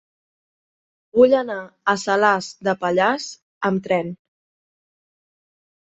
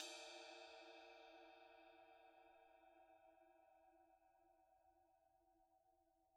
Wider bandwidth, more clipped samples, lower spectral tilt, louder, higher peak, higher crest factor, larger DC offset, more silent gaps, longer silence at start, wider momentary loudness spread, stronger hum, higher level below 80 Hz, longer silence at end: second, 8.2 kHz vs 11.5 kHz; neither; first, -5 dB/octave vs 0 dB/octave; first, -20 LUFS vs -61 LUFS; first, -2 dBFS vs -36 dBFS; second, 20 dB vs 30 dB; neither; first, 3.43-3.61 s vs none; first, 1.15 s vs 0 s; about the same, 11 LU vs 12 LU; neither; first, -62 dBFS vs under -90 dBFS; first, 1.8 s vs 0 s